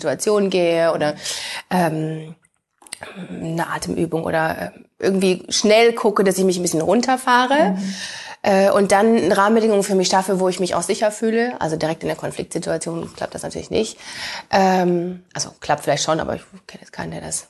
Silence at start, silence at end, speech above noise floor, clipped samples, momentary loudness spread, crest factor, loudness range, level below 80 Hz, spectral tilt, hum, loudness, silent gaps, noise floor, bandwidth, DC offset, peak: 0 s; 0.05 s; 33 dB; under 0.1%; 14 LU; 18 dB; 7 LU; -52 dBFS; -4.5 dB/octave; none; -19 LUFS; none; -52 dBFS; 12.5 kHz; under 0.1%; -2 dBFS